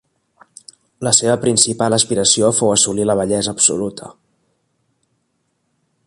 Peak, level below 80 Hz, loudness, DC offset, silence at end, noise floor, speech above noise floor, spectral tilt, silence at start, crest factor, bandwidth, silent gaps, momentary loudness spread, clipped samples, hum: 0 dBFS; -52 dBFS; -14 LUFS; under 0.1%; 1.95 s; -68 dBFS; 52 dB; -3 dB/octave; 1 s; 18 dB; 13.5 kHz; none; 10 LU; under 0.1%; none